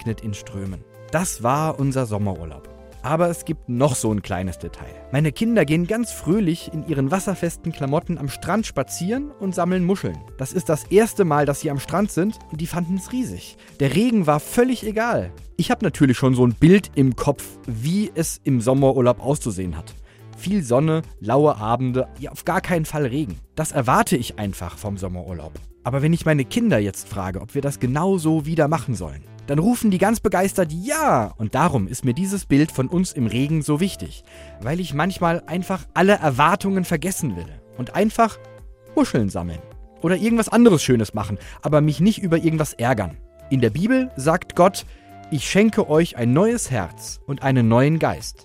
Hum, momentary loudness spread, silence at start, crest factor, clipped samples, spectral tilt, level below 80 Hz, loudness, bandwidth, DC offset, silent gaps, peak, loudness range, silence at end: none; 13 LU; 0 s; 20 dB; under 0.1%; -6 dB/octave; -44 dBFS; -21 LUFS; 16 kHz; under 0.1%; none; 0 dBFS; 4 LU; 0.1 s